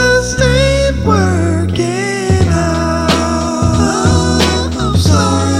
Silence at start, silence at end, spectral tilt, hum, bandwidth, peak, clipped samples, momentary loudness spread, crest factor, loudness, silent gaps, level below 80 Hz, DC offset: 0 s; 0 s; -5 dB/octave; none; 14.5 kHz; 0 dBFS; under 0.1%; 4 LU; 12 dB; -12 LUFS; none; -24 dBFS; under 0.1%